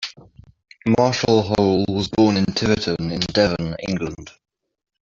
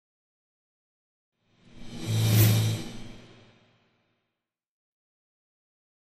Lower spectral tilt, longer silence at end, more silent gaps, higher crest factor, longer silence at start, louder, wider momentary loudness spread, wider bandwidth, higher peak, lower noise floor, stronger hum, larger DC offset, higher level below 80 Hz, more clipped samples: about the same, -5.5 dB/octave vs -5 dB/octave; second, 0.85 s vs 2.8 s; neither; about the same, 18 dB vs 22 dB; second, 0 s vs 1.75 s; first, -20 LUFS vs -24 LUFS; second, 10 LU vs 24 LU; second, 7.8 kHz vs 15 kHz; first, -2 dBFS vs -8 dBFS; second, -47 dBFS vs -86 dBFS; neither; neither; first, -46 dBFS vs -54 dBFS; neither